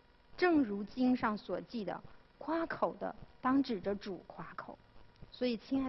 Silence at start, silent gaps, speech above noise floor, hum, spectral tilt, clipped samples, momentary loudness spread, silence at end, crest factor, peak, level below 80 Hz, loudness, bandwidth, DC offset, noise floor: 0.35 s; none; 21 dB; none; -7.5 dB/octave; under 0.1%; 16 LU; 0 s; 18 dB; -18 dBFS; -64 dBFS; -36 LUFS; 6 kHz; under 0.1%; -56 dBFS